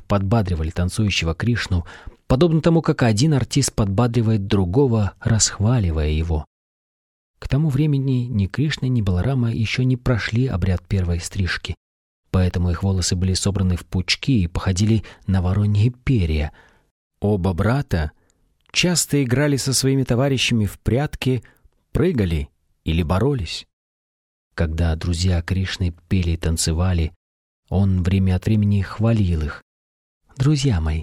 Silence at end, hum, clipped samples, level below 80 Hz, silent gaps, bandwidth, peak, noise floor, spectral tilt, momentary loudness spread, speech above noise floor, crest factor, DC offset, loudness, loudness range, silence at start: 0 s; none; under 0.1%; -32 dBFS; 6.47-7.34 s, 11.77-12.23 s, 16.91-17.10 s, 23.73-24.51 s, 27.16-27.63 s, 29.62-30.21 s; 15 kHz; -2 dBFS; -62 dBFS; -5.5 dB/octave; 7 LU; 43 dB; 18 dB; under 0.1%; -20 LUFS; 4 LU; 0 s